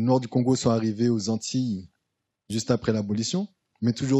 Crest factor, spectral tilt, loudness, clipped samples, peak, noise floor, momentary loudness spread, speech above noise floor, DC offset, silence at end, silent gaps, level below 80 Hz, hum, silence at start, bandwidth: 16 dB; -6 dB/octave; -26 LUFS; under 0.1%; -8 dBFS; -81 dBFS; 8 LU; 57 dB; under 0.1%; 0 s; none; -62 dBFS; none; 0 s; 11.5 kHz